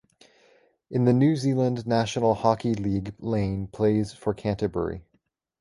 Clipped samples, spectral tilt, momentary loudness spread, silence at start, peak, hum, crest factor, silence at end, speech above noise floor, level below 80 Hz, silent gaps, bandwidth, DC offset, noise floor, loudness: under 0.1%; -7.5 dB/octave; 9 LU; 0.9 s; -6 dBFS; none; 18 dB; 0.6 s; 47 dB; -50 dBFS; none; 11.5 kHz; under 0.1%; -71 dBFS; -25 LUFS